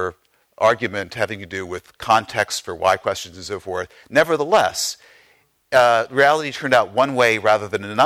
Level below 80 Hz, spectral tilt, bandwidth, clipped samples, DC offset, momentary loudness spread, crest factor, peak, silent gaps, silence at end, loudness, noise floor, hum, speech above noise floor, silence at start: -58 dBFS; -3.5 dB/octave; 16 kHz; under 0.1%; under 0.1%; 13 LU; 16 dB; -4 dBFS; none; 0 s; -19 LUFS; -58 dBFS; none; 39 dB; 0 s